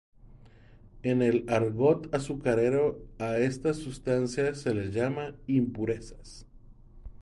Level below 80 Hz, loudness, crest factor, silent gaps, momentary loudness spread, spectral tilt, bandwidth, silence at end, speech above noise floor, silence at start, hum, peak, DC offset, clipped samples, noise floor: -52 dBFS; -29 LUFS; 18 dB; none; 11 LU; -7 dB/octave; 11.5 kHz; 0 s; 25 dB; 0.25 s; none; -12 dBFS; under 0.1%; under 0.1%; -53 dBFS